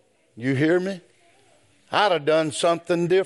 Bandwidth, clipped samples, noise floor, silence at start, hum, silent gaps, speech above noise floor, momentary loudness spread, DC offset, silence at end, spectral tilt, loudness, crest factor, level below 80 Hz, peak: 11.5 kHz; under 0.1%; -59 dBFS; 0.35 s; none; none; 38 dB; 10 LU; under 0.1%; 0 s; -5 dB/octave; -22 LUFS; 18 dB; -72 dBFS; -6 dBFS